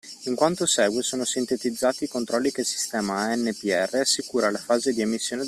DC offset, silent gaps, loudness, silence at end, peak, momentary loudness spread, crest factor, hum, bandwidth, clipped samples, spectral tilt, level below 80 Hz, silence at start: under 0.1%; none; -24 LUFS; 0 s; -6 dBFS; 5 LU; 18 dB; none; 15 kHz; under 0.1%; -2.5 dB/octave; -66 dBFS; 0.05 s